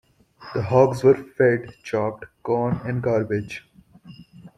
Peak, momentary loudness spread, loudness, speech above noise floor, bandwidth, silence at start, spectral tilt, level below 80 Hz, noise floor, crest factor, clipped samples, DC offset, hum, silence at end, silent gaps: -4 dBFS; 13 LU; -22 LUFS; 26 dB; 12 kHz; 0.4 s; -8 dB/octave; -56 dBFS; -47 dBFS; 20 dB; under 0.1%; under 0.1%; none; 0.1 s; none